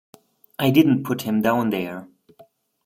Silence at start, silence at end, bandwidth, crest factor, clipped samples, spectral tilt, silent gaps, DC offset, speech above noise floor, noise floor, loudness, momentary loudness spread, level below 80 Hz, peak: 0.6 s; 0.8 s; 16.5 kHz; 18 dB; under 0.1%; -6.5 dB/octave; none; under 0.1%; 34 dB; -54 dBFS; -21 LUFS; 17 LU; -62 dBFS; -4 dBFS